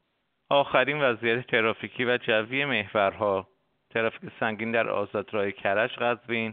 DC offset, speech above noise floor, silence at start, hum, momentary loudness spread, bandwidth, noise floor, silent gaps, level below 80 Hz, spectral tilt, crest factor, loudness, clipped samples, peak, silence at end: under 0.1%; 48 dB; 0.5 s; none; 7 LU; 4.6 kHz; -75 dBFS; none; -70 dBFS; -2.5 dB/octave; 20 dB; -26 LUFS; under 0.1%; -6 dBFS; 0 s